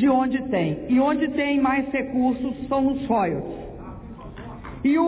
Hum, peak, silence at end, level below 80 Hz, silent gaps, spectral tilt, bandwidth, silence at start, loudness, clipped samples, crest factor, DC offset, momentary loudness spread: none; -10 dBFS; 0 s; -46 dBFS; none; -10.5 dB/octave; 4 kHz; 0 s; -23 LUFS; under 0.1%; 12 dB; under 0.1%; 18 LU